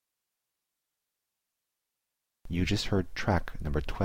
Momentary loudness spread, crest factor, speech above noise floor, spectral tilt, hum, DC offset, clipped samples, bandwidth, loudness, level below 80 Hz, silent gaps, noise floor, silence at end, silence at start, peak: 5 LU; 20 dB; 57 dB; -6 dB/octave; none; under 0.1%; under 0.1%; 16.5 kHz; -31 LUFS; -42 dBFS; none; -86 dBFS; 0 s; 0 s; -14 dBFS